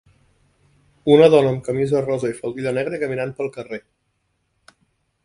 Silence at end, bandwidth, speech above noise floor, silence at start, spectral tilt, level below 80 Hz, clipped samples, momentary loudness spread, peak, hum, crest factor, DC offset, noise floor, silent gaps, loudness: 1.45 s; 11 kHz; 52 dB; 1.05 s; -7 dB/octave; -58 dBFS; under 0.1%; 16 LU; 0 dBFS; none; 20 dB; under 0.1%; -70 dBFS; none; -19 LUFS